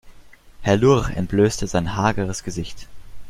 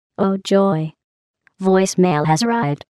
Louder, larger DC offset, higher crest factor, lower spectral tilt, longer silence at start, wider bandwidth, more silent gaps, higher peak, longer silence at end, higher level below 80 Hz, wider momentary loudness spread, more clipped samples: second, -21 LUFS vs -17 LUFS; neither; about the same, 18 dB vs 14 dB; about the same, -6 dB/octave vs -6 dB/octave; second, 0.05 s vs 0.2 s; first, 14.5 kHz vs 12.5 kHz; second, none vs 1.04-1.34 s; about the same, -2 dBFS vs -4 dBFS; second, 0 s vs 0.2 s; first, -38 dBFS vs -62 dBFS; first, 13 LU vs 7 LU; neither